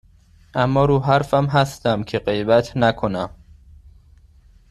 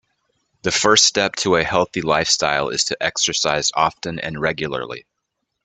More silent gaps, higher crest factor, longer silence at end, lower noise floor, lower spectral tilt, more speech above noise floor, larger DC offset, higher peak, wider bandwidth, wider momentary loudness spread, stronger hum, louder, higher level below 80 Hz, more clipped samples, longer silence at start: neither; about the same, 18 dB vs 20 dB; first, 1.45 s vs 0.65 s; second, -51 dBFS vs -76 dBFS; first, -7 dB/octave vs -2 dB/octave; second, 33 dB vs 57 dB; neither; about the same, -2 dBFS vs 0 dBFS; first, 13 kHz vs 9.6 kHz; second, 8 LU vs 13 LU; neither; about the same, -19 LUFS vs -18 LUFS; first, -44 dBFS vs -52 dBFS; neither; about the same, 0.55 s vs 0.65 s